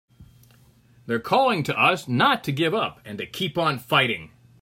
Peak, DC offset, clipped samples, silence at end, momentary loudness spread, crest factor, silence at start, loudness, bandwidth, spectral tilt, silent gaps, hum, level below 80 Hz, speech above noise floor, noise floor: -4 dBFS; under 0.1%; under 0.1%; 0.35 s; 10 LU; 20 dB; 0.2 s; -22 LUFS; 16 kHz; -5 dB/octave; none; none; -62 dBFS; 33 dB; -55 dBFS